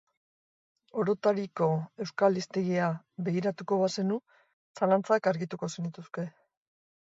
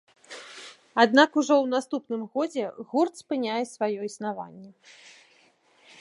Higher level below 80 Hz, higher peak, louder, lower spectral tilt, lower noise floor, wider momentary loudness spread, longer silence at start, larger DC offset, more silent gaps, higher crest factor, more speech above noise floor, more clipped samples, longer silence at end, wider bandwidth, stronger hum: first, -76 dBFS vs -82 dBFS; second, -12 dBFS vs -2 dBFS; second, -30 LUFS vs -25 LUFS; first, -6.5 dB/octave vs -4 dB/octave; first, under -90 dBFS vs -62 dBFS; second, 11 LU vs 22 LU; first, 0.95 s vs 0.3 s; neither; first, 4.53-4.75 s vs none; second, 18 dB vs 24 dB; first, over 61 dB vs 36 dB; neither; second, 0.85 s vs 1.3 s; second, 8 kHz vs 11.5 kHz; neither